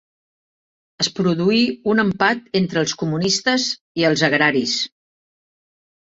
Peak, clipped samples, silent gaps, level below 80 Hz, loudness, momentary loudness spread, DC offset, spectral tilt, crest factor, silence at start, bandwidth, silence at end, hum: -2 dBFS; under 0.1%; 3.81-3.95 s; -58 dBFS; -19 LUFS; 6 LU; under 0.1%; -4 dB/octave; 20 dB; 1 s; 8 kHz; 1.25 s; none